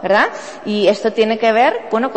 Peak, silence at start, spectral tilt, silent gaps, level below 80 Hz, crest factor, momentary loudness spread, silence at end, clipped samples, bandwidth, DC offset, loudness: -2 dBFS; 0 s; -4.5 dB/octave; none; -60 dBFS; 14 dB; 7 LU; 0 s; under 0.1%; 8.6 kHz; 0.4%; -15 LUFS